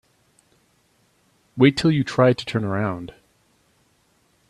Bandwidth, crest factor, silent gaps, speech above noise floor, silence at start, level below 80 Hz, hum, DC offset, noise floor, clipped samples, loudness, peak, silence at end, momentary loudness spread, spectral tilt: 12 kHz; 22 dB; none; 44 dB; 1.55 s; -56 dBFS; none; under 0.1%; -63 dBFS; under 0.1%; -20 LUFS; -2 dBFS; 1.45 s; 18 LU; -7 dB/octave